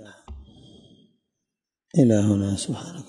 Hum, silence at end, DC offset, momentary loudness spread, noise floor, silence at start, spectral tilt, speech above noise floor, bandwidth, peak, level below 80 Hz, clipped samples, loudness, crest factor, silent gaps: none; 0.05 s; under 0.1%; 23 LU; -85 dBFS; 0 s; -7 dB/octave; 64 dB; 11.5 kHz; -6 dBFS; -52 dBFS; under 0.1%; -22 LUFS; 20 dB; none